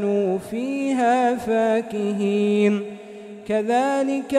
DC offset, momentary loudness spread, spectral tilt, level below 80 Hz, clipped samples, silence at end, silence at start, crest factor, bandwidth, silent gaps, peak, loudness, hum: under 0.1%; 9 LU; -6 dB/octave; -62 dBFS; under 0.1%; 0 s; 0 s; 14 dB; 13.5 kHz; none; -8 dBFS; -21 LUFS; none